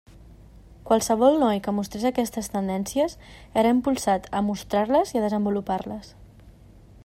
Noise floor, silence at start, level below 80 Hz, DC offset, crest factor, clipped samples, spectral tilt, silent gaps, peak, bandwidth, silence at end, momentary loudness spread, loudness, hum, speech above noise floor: -49 dBFS; 0.2 s; -50 dBFS; under 0.1%; 18 dB; under 0.1%; -5.5 dB/octave; none; -6 dBFS; 16 kHz; 0.55 s; 9 LU; -24 LUFS; none; 26 dB